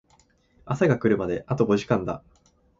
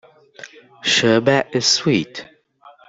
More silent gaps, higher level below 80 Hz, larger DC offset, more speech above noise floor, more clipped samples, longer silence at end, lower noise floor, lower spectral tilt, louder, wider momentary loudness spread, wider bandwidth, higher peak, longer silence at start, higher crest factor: neither; first, -52 dBFS vs -60 dBFS; neither; first, 38 dB vs 32 dB; neither; first, 0.6 s vs 0.2 s; first, -62 dBFS vs -49 dBFS; first, -7.5 dB/octave vs -3.5 dB/octave; second, -24 LUFS vs -16 LUFS; about the same, 11 LU vs 13 LU; about the same, 7.8 kHz vs 8.4 kHz; second, -6 dBFS vs -2 dBFS; first, 0.65 s vs 0.4 s; about the same, 18 dB vs 18 dB